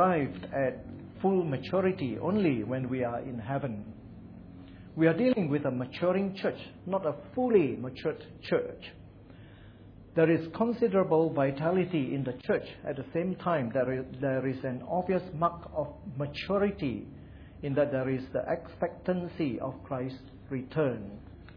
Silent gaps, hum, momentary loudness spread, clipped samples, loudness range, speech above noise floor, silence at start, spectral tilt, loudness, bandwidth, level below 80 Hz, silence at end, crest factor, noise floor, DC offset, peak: none; none; 15 LU; under 0.1%; 4 LU; 21 dB; 0 s; -10 dB/octave; -31 LUFS; 5.4 kHz; -58 dBFS; 0.05 s; 20 dB; -51 dBFS; under 0.1%; -12 dBFS